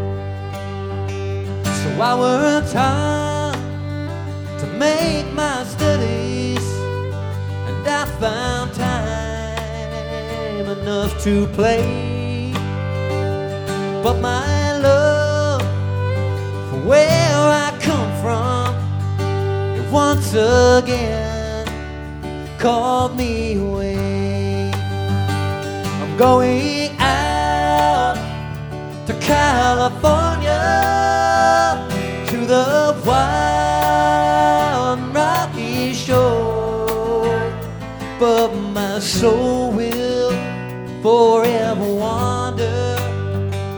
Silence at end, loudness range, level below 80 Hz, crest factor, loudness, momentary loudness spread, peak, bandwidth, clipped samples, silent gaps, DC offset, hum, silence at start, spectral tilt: 0 s; 5 LU; -34 dBFS; 18 dB; -18 LUFS; 11 LU; 0 dBFS; over 20 kHz; under 0.1%; none; under 0.1%; none; 0 s; -5.5 dB/octave